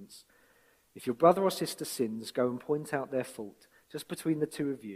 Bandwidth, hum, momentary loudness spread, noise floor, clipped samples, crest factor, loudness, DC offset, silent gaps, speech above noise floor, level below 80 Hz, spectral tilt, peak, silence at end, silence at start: 16 kHz; none; 19 LU; -66 dBFS; under 0.1%; 24 dB; -31 LUFS; under 0.1%; none; 35 dB; -74 dBFS; -5 dB/octave; -10 dBFS; 0 s; 0 s